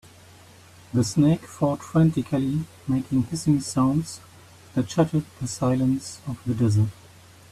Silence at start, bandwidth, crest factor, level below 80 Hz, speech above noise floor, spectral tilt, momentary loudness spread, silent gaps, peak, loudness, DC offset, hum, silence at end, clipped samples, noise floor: 0.95 s; 14 kHz; 16 dB; -52 dBFS; 26 dB; -7 dB/octave; 9 LU; none; -8 dBFS; -24 LUFS; under 0.1%; none; 0.6 s; under 0.1%; -49 dBFS